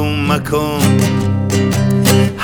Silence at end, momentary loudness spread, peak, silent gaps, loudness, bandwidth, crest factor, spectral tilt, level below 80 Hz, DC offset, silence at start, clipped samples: 0 s; 4 LU; 0 dBFS; none; -14 LUFS; over 20 kHz; 12 dB; -5.5 dB/octave; -36 dBFS; under 0.1%; 0 s; under 0.1%